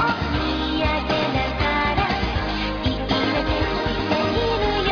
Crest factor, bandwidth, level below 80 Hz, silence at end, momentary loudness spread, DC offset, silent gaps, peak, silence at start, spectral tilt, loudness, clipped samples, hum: 14 dB; 5.4 kHz; -30 dBFS; 0 s; 3 LU; under 0.1%; none; -8 dBFS; 0 s; -6 dB/octave; -22 LUFS; under 0.1%; none